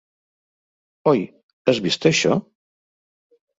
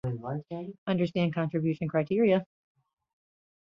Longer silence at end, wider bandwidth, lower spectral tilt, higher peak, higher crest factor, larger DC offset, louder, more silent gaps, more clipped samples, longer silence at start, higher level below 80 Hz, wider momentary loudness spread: about the same, 1.15 s vs 1.25 s; first, 8 kHz vs 6.4 kHz; second, -4.5 dB/octave vs -9 dB/octave; first, -2 dBFS vs -14 dBFS; first, 22 dB vs 16 dB; neither; first, -20 LUFS vs -29 LUFS; first, 1.43-1.65 s vs 0.78-0.86 s; neither; first, 1.05 s vs 0.05 s; about the same, -62 dBFS vs -64 dBFS; second, 7 LU vs 11 LU